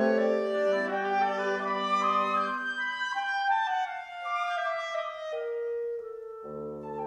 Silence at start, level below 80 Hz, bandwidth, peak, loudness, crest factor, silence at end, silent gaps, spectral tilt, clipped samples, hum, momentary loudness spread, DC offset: 0 s; -72 dBFS; 11 kHz; -14 dBFS; -30 LUFS; 16 dB; 0 s; none; -4.5 dB/octave; under 0.1%; none; 12 LU; under 0.1%